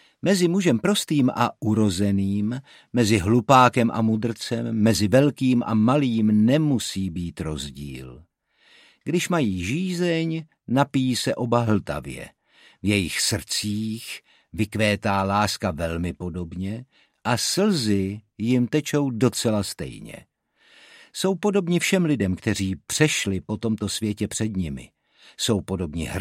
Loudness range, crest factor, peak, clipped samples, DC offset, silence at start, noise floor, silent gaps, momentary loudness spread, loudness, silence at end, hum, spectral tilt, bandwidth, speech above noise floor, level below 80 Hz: 6 LU; 22 dB; -2 dBFS; under 0.1%; under 0.1%; 0.25 s; -59 dBFS; none; 13 LU; -23 LUFS; 0 s; none; -5 dB/octave; 16 kHz; 37 dB; -50 dBFS